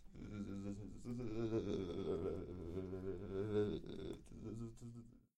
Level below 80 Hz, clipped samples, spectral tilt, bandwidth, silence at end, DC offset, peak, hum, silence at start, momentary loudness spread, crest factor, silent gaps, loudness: -60 dBFS; under 0.1%; -8 dB/octave; 11.5 kHz; 0.2 s; under 0.1%; -28 dBFS; none; 0 s; 11 LU; 18 dB; none; -46 LUFS